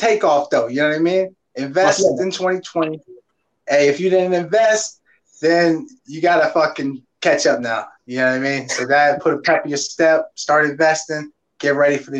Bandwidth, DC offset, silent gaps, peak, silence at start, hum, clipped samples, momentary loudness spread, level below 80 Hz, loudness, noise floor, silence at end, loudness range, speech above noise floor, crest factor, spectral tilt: 9.4 kHz; under 0.1%; none; 0 dBFS; 0 s; none; under 0.1%; 11 LU; -68 dBFS; -17 LUFS; -56 dBFS; 0 s; 2 LU; 39 dB; 16 dB; -4 dB/octave